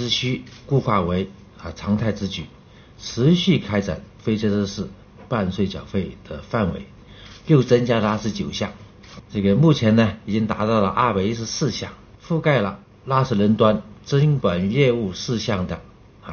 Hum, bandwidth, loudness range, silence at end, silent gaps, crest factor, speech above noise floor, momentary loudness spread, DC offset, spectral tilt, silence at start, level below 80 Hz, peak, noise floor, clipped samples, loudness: none; 6.8 kHz; 4 LU; 0 s; none; 18 dB; 22 dB; 15 LU; under 0.1%; -6 dB/octave; 0 s; -46 dBFS; -4 dBFS; -43 dBFS; under 0.1%; -21 LUFS